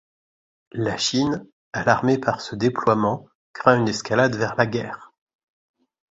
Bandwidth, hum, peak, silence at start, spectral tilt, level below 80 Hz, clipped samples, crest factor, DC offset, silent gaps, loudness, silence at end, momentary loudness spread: 8 kHz; none; 0 dBFS; 0.75 s; -5 dB/octave; -56 dBFS; under 0.1%; 22 dB; under 0.1%; 1.52-1.72 s, 3.35-3.54 s; -22 LUFS; 1.05 s; 13 LU